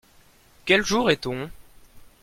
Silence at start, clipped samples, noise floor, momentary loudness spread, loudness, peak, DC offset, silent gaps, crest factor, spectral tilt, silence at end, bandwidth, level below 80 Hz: 0.65 s; under 0.1%; -55 dBFS; 16 LU; -22 LUFS; -6 dBFS; under 0.1%; none; 22 dB; -4 dB/octave; 0.2 s; 16.5 kHz; -50 dBFS